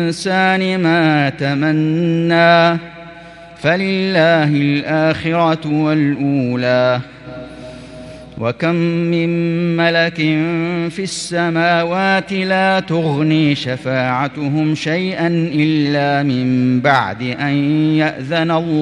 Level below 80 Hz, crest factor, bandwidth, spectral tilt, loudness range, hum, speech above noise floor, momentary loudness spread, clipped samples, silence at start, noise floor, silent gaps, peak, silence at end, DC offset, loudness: -52 dBFS; 16 dB; 11 kHz; -6.5 dB/octave; 4 LU; none; 22 dB; 9 LU; under 0.1%; 0 s; -36 dBFS; none; 0 dBFS; 0 s; under 0.1%; -15 LUFS